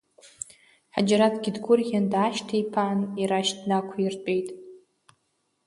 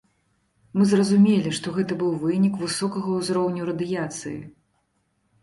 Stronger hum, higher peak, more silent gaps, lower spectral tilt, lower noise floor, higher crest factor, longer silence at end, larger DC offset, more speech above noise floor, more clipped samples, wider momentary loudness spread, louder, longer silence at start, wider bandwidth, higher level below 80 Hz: neither; about the same, -8 dBFS vs -8 dBFS; neither; about the same, -5 dB/octave vs -6 dB/octave; first, -74 dBFS vs -70 dBFS; about the same, 18 dB vs 16 dB; about the same, 0.9 s vs 0.9 s; neither; about the same, 49 dB vs 48 dB; neither; first, 17 LU vs 12 LU; about the same, -25 LUFS vs -23 LUFS; second, 0.25 s vs 0.75 s; about the same, 11.5 kHz vs 11.5 kHz; second, -70 dBFS vs -62 dBFS